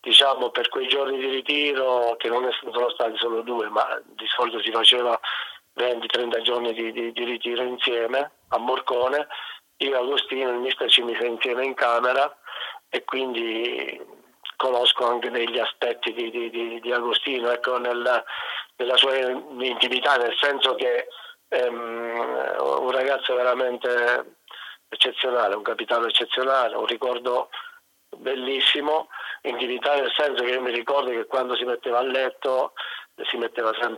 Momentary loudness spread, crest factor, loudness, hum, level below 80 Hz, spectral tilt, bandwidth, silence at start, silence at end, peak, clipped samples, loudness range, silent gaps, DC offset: 11 LU; 22 dB; -23 LUFS; none; -80 dBFS; -1.5 dB/octave; 16.5 kHz; 0.05 s; 0 s; -2 dBFS; under 0.1%; 3 LU; none; under 0.1%